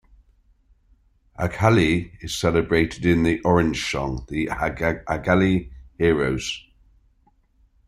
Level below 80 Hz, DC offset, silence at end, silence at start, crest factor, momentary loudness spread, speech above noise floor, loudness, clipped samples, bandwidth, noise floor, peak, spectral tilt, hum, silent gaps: -42 dBFS; under 0.1%; 1.3 s; 1.4 s; 20 dB; 9 LU; 40 dB; -22 LUFS; under 0.1%; 15.5 kHz; -61 dBFS; -2 dBFS; -6 dB/octave; none; none